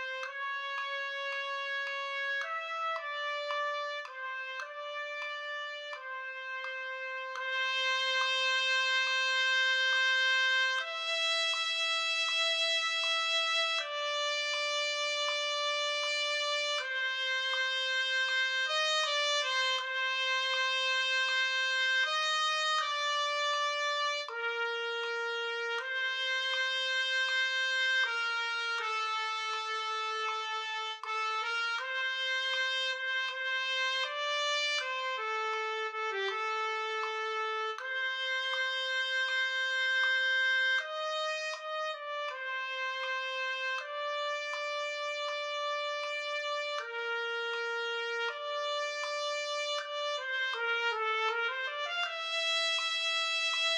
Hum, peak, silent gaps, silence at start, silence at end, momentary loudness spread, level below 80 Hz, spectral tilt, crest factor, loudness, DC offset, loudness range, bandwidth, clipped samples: none; -18 dBFS; none; 0 s; 0 s; 8 LU; under -90 dBFS; 4.5 dB/octave; 16 dB; -31 LUFS; under 0.1%; 7 LU; 11 kHz; under 0.1%